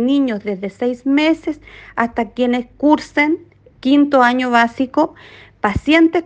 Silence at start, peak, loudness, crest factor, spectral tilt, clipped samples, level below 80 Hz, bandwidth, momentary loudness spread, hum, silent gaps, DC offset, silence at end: 0 s; 0 dBFS; -16 LUFS; 16 dB; -6 dB/octave; under 0.1%; -44 dBFS; 8.6 kHz; 11 LU; none; none; under 0.1%; 0 s